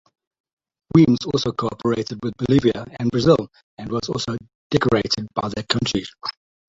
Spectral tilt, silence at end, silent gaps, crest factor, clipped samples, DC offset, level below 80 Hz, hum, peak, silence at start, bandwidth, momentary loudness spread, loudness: -6 dB/octave; 0.35 s; 3.63-3.77 s, 4.55-4.70 s; 20 dB; under 0.1%; under 0.1%; -46 dBFS; none; -2 dBFS; 0.95 s; 7.8 kHz; 12 LU; -21 LUFS